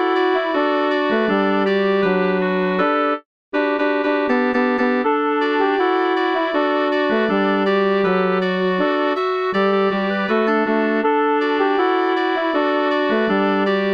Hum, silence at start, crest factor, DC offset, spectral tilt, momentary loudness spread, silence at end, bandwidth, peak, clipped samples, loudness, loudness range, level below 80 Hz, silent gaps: none; 0 s; 12 dB; 0.1%; -7.5 dB/octave; 2 LU; 0 s; 6.2 kHz; -6 dBFS; under 0.1%; -18 LUFS; 1 LU; -62 dBFS; 3.25-3.52 s